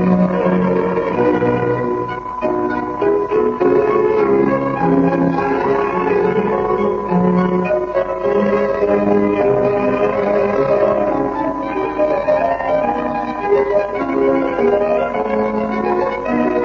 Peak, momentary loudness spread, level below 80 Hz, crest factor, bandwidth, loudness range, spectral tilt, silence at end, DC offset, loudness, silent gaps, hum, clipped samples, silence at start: -4 dBFS; 5 LU; -42 dBFS; 12 dB; 6.8 kHz; 2 LU; -9 dB/octave; 0 s; under 0.1%; -16 LUFS; none; none; under 0.1%; 0 s